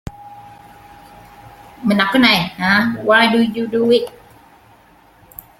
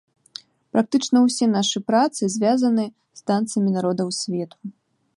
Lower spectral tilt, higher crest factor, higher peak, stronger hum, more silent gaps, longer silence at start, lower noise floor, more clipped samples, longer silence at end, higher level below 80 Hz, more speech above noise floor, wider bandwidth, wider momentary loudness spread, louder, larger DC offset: about the same, -5 dB/octave vs -5 dB/octave; about the same, 18 dB vs 16 dB; first, 0 dBFS vs -6 dBFS; neither; neither; second, 0.05 s vs 0.75 s; first, -49 dBFS vs -44 dBFS; neither; first, 1.5 s vs 0.45 s; first, -50 dBFS vs -70 dBFS; first, 34 dB vs 23 dB; first, 16 kHz vs 11.5 kHz; second, 9 LU vs 21 LU; first, -14 LUFS vs -21 LUFS; neither